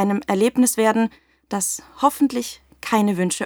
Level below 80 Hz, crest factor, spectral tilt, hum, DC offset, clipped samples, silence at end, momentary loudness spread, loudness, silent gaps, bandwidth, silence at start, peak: -60 dBFS; 16 dB; -4.5 dB/octave; none; under 0.1%; under 0.1%; 0 s; 11 LU; -20 LUFS; none; over 20 kHz; 0 s; -4 dBFS